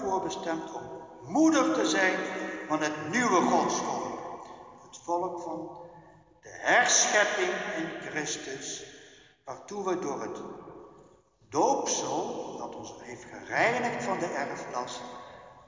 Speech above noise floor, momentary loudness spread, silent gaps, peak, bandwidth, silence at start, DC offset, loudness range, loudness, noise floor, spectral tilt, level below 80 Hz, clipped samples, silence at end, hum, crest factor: 30 dB; 21 LU; none; -10 dBFS; 7.6 kHz; 0 s; under 0.1%; 8 LU; -28 LUFS; -59 dBFS; -2.5 dB/octave; -68 dBFS; under 0.1%; 0.05 s; none; 20 dB